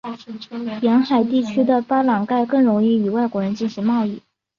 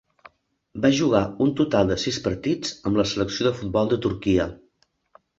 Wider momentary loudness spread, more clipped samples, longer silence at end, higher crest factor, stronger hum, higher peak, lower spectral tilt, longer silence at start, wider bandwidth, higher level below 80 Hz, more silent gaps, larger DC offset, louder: first, 13 LU vs 5 LU; neither; second, 0.4 s vs 0.85 s; second, 14 dB vs 20 dB; neither; about the same, -4 dBFS vs -4 dBFS; first, -7.5 dB/octave vs -5.5 dB/octave; second, 0.05 s vs 0.75 s; second, 7 kHz vs 8 kHz; second, -64 dBFS vs -46 dBFS; neither; neither; first, -19 LUFS vs -23 LUFS